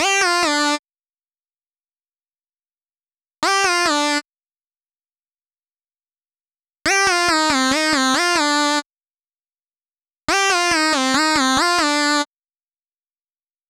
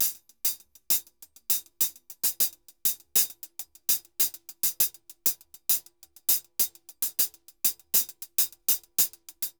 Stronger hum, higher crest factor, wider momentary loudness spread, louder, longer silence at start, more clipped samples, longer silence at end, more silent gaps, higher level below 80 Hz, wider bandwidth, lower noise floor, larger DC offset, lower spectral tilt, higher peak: neither; second, 18 dB vs 24 dB; about the same, 7 LU vs 6 LU; first, -17 LUFS vs -26 LUFS; about the same, 0 s vs 0 s; neither; first, 1.45 s vs 0.1 s; first, 0.79-0.83 s, 8.86-8.90 s vs none; first, -54 dBFS vs -72 dBFS; about the same, over 20 kHz vs over 20 kHz; first, under -90 dBFS vs -52 dBFS; neither; first, -0.5 dB/octave vs 2 dB/octave; first, -2 dBFS vs -6 dBFS